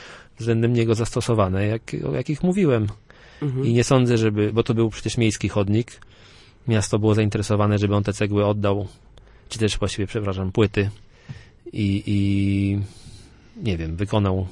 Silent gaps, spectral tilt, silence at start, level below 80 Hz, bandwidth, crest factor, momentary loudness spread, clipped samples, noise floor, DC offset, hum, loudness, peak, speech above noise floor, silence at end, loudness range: none; -6.5 dB/octave; 0 s; -44 dBFS; 11.5 kHz; 18 dB; 10 LU; under 0.1%; -49 dBFS; under 0.1%; none; -22 LUFS; -4 dBFS; 28 dB; 0 s; 4 LU